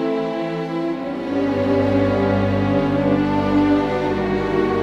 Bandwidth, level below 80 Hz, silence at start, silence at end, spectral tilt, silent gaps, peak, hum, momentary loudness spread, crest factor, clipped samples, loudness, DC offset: 8 kHz; -40 dBFS; 0 s; 0 s; -8 dB/octave; none; -6 dBFS; none; 6 LU; 12 dB; under 0.1%; -19 LUFS; under 0.1%